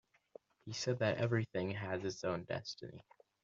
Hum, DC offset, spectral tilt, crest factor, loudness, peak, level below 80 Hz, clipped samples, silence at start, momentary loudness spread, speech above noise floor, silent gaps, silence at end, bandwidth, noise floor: none; under 0.1%; -5 dB/octave; 20 dB; -39 LUFS; -20 dBFS; -74 dBFS; under 0.1%; 0.65 s; 16 LU; 23 dB; none; 0.45 s; 7.4 kHz; -62 dBFS